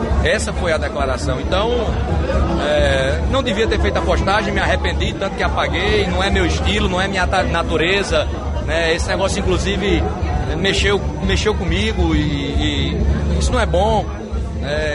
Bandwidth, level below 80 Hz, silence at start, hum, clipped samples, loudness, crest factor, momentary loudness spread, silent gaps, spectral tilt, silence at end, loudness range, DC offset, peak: 11.5 kHz; -22 dBFS; 0 s; none; under 0.1%; -18 LUFS; 12 dB; 4 LU; none; -5 dB/octave; 0 s; 1 LU; under 0.1%; -4 dBFS